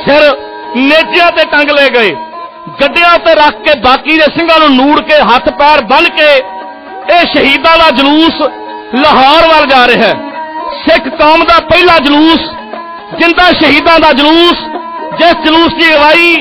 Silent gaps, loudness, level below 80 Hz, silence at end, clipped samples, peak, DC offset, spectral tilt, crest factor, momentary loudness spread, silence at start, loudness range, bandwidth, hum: none; -5 LUFS; -34 dBFS; 0 s; 1%; 0 dBFS; under 0.1%; -4.5 dB/octave; 6 dB; 15 LU; 0 s; 2 LU; 15.5 kHz; none